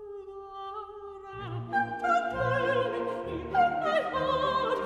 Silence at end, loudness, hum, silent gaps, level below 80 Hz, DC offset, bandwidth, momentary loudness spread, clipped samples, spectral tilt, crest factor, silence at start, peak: 0 s; -29 LUFS; none; none; -56 dBFS; under 0.1%; 11 kHz; 16 LU; under 0.1%; -6 dB/octave; 16 dB; 0 s; -14 dBFS